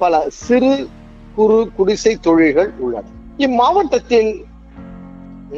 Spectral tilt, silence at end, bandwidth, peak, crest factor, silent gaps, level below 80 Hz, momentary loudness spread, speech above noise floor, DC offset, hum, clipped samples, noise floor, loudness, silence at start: -5 dB/octave; 0 s; 7.8 kHz; -2 dBFS; 14 dB; none; -42 dBFS; 22 LU; 21 dB; under 0.1%; none; under 0.1%; -35 dBFS; -15 LUFS; 0 s